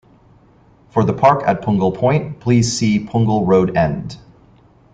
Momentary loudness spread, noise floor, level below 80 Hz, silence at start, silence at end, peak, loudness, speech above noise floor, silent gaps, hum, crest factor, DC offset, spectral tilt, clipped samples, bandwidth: 6 LU; -50 dBFS; -46 dBFS; 0.95 s; 0.75 s; 0 dBFS; -16 LUFS; 34 dB; none; none; 16 dB; under 0.1%; -6.5 dB/octave; under 0.1%; 9.4 kHz